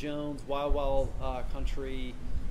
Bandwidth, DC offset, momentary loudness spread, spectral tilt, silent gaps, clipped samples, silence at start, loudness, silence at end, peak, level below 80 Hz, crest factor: 9.8 kHz; under 0.1%; 9 LU; -7 dB/octave; none; under 0.1%; 0 s; -35 LUFS; 0 s; -14 dBFS; -34 dBFS; 14 dB